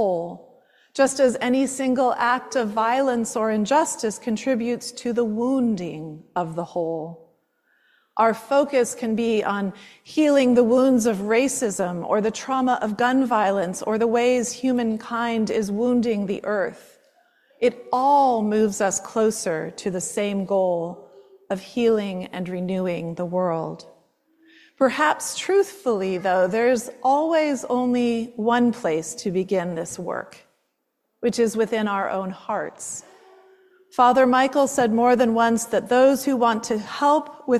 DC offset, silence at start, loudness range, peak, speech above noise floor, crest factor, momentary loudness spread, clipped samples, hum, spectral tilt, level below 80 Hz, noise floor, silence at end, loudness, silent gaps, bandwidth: under 0.1%; 0 s; 6 LU; -6 dBFS; 53 dB; 18 dB; 11 LU; under 0.1%; none; -4.5 dB/octave; -64 dBFS; -75 dBFS; 0 s; -22 LUFS; none; 14 kHz